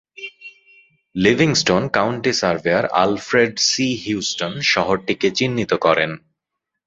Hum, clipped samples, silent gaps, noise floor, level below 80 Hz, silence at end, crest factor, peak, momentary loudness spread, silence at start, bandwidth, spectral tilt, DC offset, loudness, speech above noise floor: none; under 0.1%; none; -80 dBFS; -52 dBFS; 0.7 s; 18 dB; 0 dBFS; 8 LU; 0.2 s; 8 kHz; -4 dB/octave; under 0.1%; -18 LUFS; 62 dB